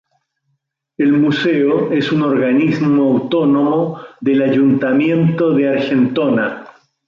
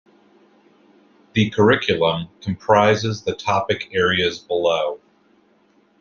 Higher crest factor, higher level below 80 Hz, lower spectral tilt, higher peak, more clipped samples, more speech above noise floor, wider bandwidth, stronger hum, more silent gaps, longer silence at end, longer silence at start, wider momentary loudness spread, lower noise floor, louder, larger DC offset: second, 10 dB vs 20 dB; about the same, -58 dBFS vs -56 dBFS; first, -8.5 dB/octave vs -5.5 dB/octave; about the same, -4 dBFS vs -2 dBFS; neither; first, 55 dB vs 39 dB; about the same, 6.8 kHz vs 7.2 kHz; neither; neither; second, 0.4 s vs 1.05 s; second, 1 s vs 1.35 s; second, 5 LU vs 11 LU; first, -69 dBFS vs -58 dBFS; first, -15 LUFS vs -19 LUFS; neither